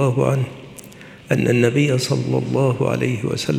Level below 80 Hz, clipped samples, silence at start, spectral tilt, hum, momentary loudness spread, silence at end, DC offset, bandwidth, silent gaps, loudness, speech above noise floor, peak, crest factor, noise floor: -54 dBFS; under 0.1%; 0 s; -6.5 dB/octave; none; 21 LU; 0 s; under 0.1%; 14.5 kHz; none; -19 LUFS; 22 dB; -2 dBFS; 18 dB; -40 dBFS